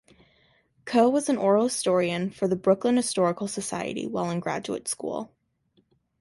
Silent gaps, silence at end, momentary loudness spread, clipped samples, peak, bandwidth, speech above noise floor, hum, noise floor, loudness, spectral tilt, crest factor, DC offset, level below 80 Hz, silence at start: none; 0.95 s; 9 LU; under 0.1%; -8 dBFS; 11.5 kHz; 43 dB; none; -68 dBFS; -25 LUFS; -5 dB/octave; 18 dB; under 0.1%; -66 dBFS; 0.85 s